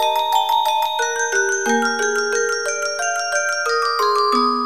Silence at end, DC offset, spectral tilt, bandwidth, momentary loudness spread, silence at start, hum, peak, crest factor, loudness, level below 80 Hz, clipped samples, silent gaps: 0 s; 0.5%; 0 dB/octave; 16 kHz; 4 LU; 0 s; none; -4 dBFS; 16 dB; -18 LUFS; -70 dBFS; under 0.1%; none